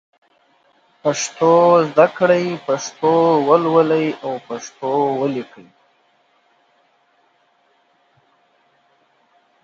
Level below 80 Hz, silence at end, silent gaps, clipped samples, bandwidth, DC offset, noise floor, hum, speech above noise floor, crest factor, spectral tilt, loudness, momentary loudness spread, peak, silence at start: -70 dBFS; 4.2 s; none; under 0.1%; 7.8 kHz; under 0.1%; -60 dBFS; none; 44 dB; 18 dB; -5 dB/octave; -17 LUFS; 13 LU; 0 dBFS; 1.05 s